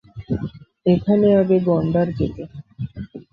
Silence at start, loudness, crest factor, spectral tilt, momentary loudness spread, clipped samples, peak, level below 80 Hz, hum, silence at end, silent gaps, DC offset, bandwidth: 0.15 s; -19 LUFS; 16 dB; -11 dB/octave; 18 LU; under 0.1%; -4 dBFS; -44 dBFS; none; 0.1 s; none; under 0.1%; 5.4 kHz